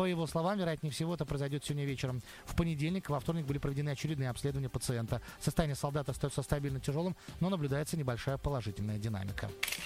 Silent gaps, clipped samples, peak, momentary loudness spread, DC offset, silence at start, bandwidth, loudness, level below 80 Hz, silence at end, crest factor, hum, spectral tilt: none; under 0.1%; -14 dBFS; 4 LU; under 0.1%; 0 s; 16 kHz; -36 LUFS; -50 dBFS; 0 s; 22 dB; none; -6 dB/octave